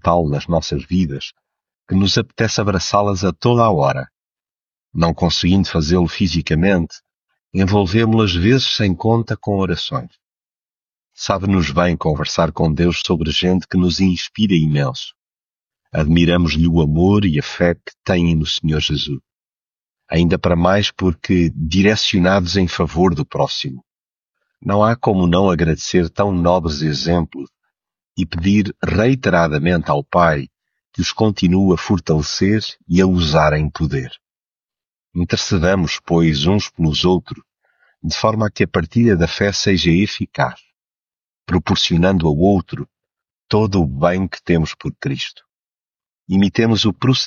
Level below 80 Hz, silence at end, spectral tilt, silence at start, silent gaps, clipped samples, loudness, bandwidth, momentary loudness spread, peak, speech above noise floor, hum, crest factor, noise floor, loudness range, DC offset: -34 dBFS; 0 s; -6 dB/octave; 0.05 s; 7.17-7.21 s; under 0.1%; -17 LUFS; 7.4 kHz; 9 LU; -2 dBFS; over 74 dB; none; 16 dB; under -90 dBFS; 3 LU; under 0.1%